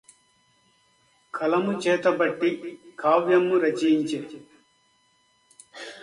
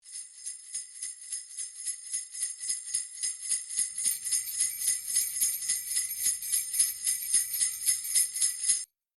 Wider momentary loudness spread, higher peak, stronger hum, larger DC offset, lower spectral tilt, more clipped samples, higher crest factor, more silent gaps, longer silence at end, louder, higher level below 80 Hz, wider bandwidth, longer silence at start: first, 20 LU vs 12 LU; about the same, -8 dBFS vs -10 dBFS; neither; neither; first, -5.5 dB/octave vs 4.5 dB/octave; neither; about the same, 18 dB vs 20 dB; neither; second, 0 s vs 0.3 s; first, -23 LUFS vs -28 LUFS; about the same, -74 dBFS vs -78 dBFS; second, 11.5 kHz vs 19 kHz; first, 1.35 s vs 0.05 s